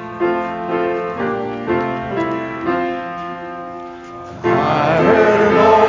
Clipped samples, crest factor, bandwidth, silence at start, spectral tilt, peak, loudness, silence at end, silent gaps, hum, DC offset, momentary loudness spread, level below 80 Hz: under 0.1%; 16 dB; 7.6 kHz; 0 s; -7 dB/octave; 0 dBFS; -17 LUFS; 0 s; none; none; under 0.1%; 17 LU; -46 dBFS